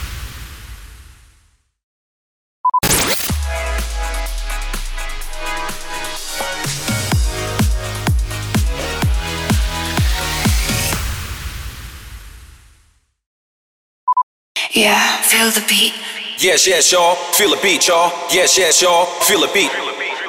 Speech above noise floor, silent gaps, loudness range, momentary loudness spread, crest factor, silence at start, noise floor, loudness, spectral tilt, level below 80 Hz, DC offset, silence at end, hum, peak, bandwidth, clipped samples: 42 dB; 1.84-2.64 s, 13.26-14.07 s, 14.23-14.55 s; 11 LU; 16 LU; 16 dB; 0 s; -56 dBFS; -15 LUFS; -2.5 dB/octave; -26 dBFS; under 0.1%; 0 s; none; -2 dBFS; over 20 kHz; under 0.1%